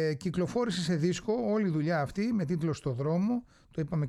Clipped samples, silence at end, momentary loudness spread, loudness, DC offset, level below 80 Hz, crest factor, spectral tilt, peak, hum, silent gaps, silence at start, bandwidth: under 0.1%; 0 s; 4 LU; -31 LUFS; under 0.1%; -58 dBFS; 12 dB; -6.5 dB/octave; -18 dBFS; none; none; 0 s; 12 kHz